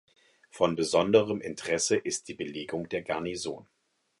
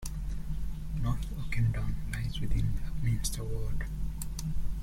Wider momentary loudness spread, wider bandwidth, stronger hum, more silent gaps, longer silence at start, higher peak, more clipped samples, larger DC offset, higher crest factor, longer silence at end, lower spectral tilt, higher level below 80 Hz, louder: first, 13 LU vs 8 LU; second, 11.5 kHz vs 16 kHz; neither; neither; first, 0.55 s vs 0 s; first, -8 dBFS vs -16 dBFS; neither; neither; first, 22 dB vs 14 dB; first, 0.6 s vs 0 s; second, -3.5 dB/octave vs -5.5 dB/octave; second, -64 dBFS vs -34 dBFS; first, -29 LUFS vs -35 LUFS